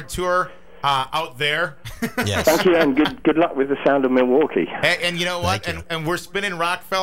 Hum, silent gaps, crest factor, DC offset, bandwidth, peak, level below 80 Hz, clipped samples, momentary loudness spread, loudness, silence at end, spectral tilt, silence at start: none; none; 18 dB; 0.8%; 16 kHz; -2 dBFS; -46 dBFS; under 0.1%; 8 LU; -20 LUFS; 0 s; -4.5 dB/octave; 0 s